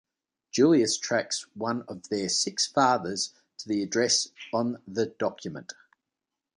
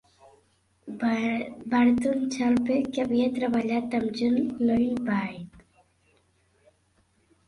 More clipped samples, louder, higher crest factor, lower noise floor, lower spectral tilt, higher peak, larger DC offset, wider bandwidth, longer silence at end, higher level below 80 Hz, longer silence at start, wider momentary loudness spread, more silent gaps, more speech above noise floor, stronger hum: neither; about the same, -27 LUFS vs -26 LUFS; about the same, 18 dB vs 16 dB; first, -87 dBFS vs -67 dBFS; second, -3 dB/octave vs -6 dB/octave; about the same, -10 dBFS vs -12 dBFS; neither; about the same, 11 kHz vs 11 kHz; second, 0.85 s vs 1.85 s; second, -70 dBFS vs -60 dBFS; second, 0.55 s vs 0.85 s; first, 12 LU vs 8 LU; neither; first, 60 dB vs 42 dB; neither